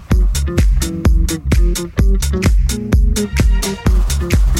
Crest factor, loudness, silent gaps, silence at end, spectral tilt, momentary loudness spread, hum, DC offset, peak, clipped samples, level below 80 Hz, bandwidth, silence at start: 10 dB; -16 LUFS; none; 0 s; -5.5 dB/octave; 2 LU; none; under 0.1%; -2 dBFS; under 0.1%; -14 dBFS; 15.5 kHz; 0 s